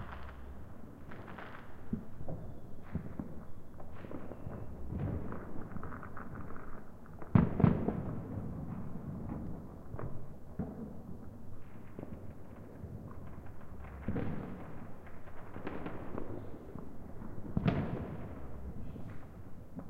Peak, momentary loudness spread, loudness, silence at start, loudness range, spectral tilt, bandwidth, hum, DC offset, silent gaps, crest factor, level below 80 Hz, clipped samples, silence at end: -10 dBFS; 16 LU; -41 LUFS; 0 s; 12 LU; -9.5 dB/octave; 5 kHz; none; under 0.1%; none; 28 dB; -50 dBFS; under 0.1%; 0 s